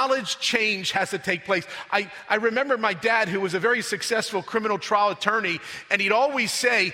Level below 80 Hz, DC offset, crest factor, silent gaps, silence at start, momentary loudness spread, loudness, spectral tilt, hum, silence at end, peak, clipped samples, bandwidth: -68 dBFS; under 0.1%; 20 dB; none; 0 s; 6 LU; -23 LUFS; -2.5 dB/octave; none; 0 s; -4 dBFS; under 0.1%; 16 kHz